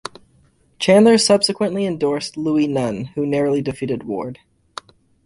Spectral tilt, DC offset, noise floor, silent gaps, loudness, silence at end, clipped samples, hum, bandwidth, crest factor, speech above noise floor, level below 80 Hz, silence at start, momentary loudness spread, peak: -4.5 dB/octave; under 0.1%; -56 dBFS; none; -18 LUFS; 0.9 s; under 0.1%; none; 11.5 kHz; 16 dB; 39 dB; -56 dBFS; 0.8 s; 22 LU; -2 dBFS